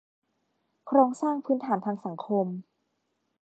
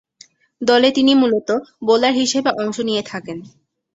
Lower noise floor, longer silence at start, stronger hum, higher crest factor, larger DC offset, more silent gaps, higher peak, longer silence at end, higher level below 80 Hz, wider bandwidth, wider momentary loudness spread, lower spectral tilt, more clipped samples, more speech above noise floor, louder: first, -77 dBFS vs -50 dBFS; first, 0.85 s vs 0.6 s; neither; first, 22 dB vs 16 dB; neither; neither; second, -8 dBFS vs -2 dBFS; first, 0.8 s vs 0.5 s; second, -86 dBFS vs -62 dBFS; about the same, 8.8 kHz vs 8 kHz; second, 11 LU vs 15 LU; first, -8 dB/octave vs -3.5 dB/octave; neither; first, 51 dB vs 33 dB; second, -27 LUFS vs -17 LUFS